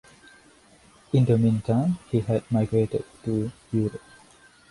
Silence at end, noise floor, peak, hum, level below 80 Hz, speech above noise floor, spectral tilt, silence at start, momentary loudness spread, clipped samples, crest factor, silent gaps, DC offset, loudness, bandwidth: 0.75 s; -55 dBFS; -8 dBFS; none; -54 dBFS; 31 dB; -9 dB/octave; 1.15 s; 8 LU; under 0.1%; 18 dB; none; under 0.1%; -25 LUFS; 11.5 kHz